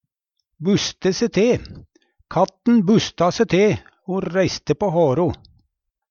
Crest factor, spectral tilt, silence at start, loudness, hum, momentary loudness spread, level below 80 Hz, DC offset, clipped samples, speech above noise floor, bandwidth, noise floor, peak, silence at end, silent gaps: 16 dB; -5.5 dB/octave; 0.6 s; -19 LUFS; none; 9 LU; -48 dBFS; under 0.1%; under 0.1%; 58 dB; 7.2 kHz; -77 dBFS; -4 dBFS; 0.75 s; none